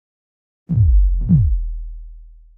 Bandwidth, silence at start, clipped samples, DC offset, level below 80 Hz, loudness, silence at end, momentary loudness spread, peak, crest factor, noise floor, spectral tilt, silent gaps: 0.9 kHz; 0.7 s; under 0.1%; under 0.1%; -20 dBFS; -17 LUFS; 0.35 s; 17 LU; -4 dBFS; 14 dB; -39 dBFS; -14.5 dB/octave; none